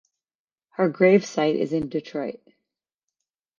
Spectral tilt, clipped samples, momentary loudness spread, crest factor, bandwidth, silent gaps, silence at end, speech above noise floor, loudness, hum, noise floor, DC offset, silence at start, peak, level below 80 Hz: -6.5 dB/octave; under 0.1%; 14 LU; 20 dB; 7.4 kHz; none; 1.25 s; over 68 dB; -22 LUFS; none; under -90 dBFS; under 0.1%; 0.8 s; -6 dBFS; -64 dBFS